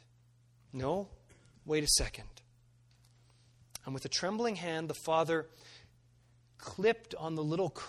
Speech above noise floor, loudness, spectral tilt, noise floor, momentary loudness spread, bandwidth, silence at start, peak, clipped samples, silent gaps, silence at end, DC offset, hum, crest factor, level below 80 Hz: 31 dB; -34 LUFS; -3.5 dB/octave; -66 dBFS; 21 LU; 14 kHz; 0.75 s; -14 dBFS; under 0.1%; none; 0 s; under 0.1%; none; 22 dB; -54 dBFS